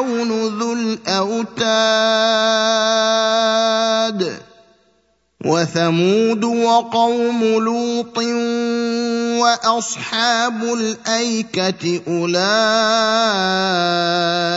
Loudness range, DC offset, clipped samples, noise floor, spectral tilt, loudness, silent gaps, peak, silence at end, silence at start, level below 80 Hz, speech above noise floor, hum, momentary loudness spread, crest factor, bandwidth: 3 LU; under 0.1%; under 0.1%; -62 dBFS; -3.5 dB/octave; -17 LUFS; none; 0 dBFS; 0 s; 0 s; -66 dBFS; 45 dB; none; 6 LU; 16 dB; 8 kHz